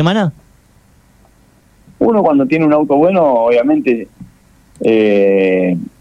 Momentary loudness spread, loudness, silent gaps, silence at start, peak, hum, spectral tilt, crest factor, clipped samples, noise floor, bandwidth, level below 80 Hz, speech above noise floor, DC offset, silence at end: 7 LU; -12 LUFS; none; 0 s; -2 dBFS; none; -8 dB/octave; 12 dB; under 0.1%; -49 dBFS; 9.4 kHz; -52 dBFS; 37 dB; under 0.1%; 0.15 s